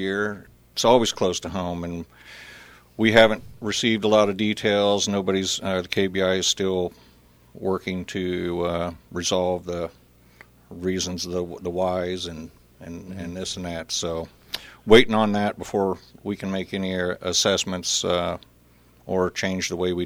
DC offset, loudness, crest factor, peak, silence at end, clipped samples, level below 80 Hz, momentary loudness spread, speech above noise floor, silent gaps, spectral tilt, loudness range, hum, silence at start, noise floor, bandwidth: under 0.1%; -23 LUFS; 22 dB; -2 dBFS; 0 s; under 0.1%; -50 dBFS; 16 LU; 32 dB; none; -3.5 dB/octave; 8 LU; none; 0 s; -55 dBFS; over 20 kHz